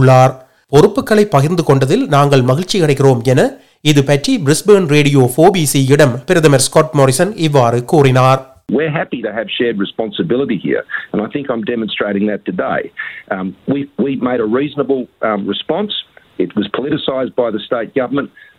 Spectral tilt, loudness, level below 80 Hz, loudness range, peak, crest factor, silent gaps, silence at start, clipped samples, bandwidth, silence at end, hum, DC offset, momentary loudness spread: -5.5 dB/octave; -13 LUFS; -48 dBFS; 7 LU; 0 dBFS; 12 dB; none; 0 s; 0.4%; 16 kHz; 0.3 s; none; under 0.1%; 10 LU